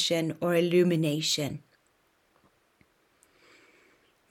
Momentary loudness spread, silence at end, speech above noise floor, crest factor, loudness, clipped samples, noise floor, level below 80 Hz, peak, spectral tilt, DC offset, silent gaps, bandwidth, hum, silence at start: 9 LU; 2.7 s; 43 dB; 18 dB; -26 LUFS; under 0.1%; -69 dBFS; -72 dBFS; -12 dBFS; -4.5 dB/octave; under 0.1%; none; 17 kHz; none; 0 s